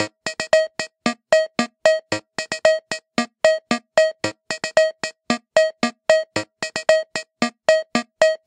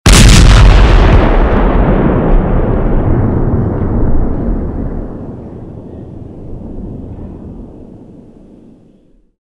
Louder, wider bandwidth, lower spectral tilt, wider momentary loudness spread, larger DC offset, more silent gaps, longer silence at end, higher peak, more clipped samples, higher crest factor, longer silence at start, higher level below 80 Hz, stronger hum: second, -21 LUFS vs -10 LUFS; second, 11 kHz vs 13 kHz; second, -3 dB/octave vs -5.5 dB/octave; second, 8 LU vs 23 LU; neither; neither; second, 0.1 s vs 1.45 s; about the same, 0 dBFS vs 0 dBFS; second, under 0.1% vs 2%; first, 20 dB vs 10 dB; about the same, 0 s vs 0.05 s; second, -64 dBFS vs -12 dBFS; neither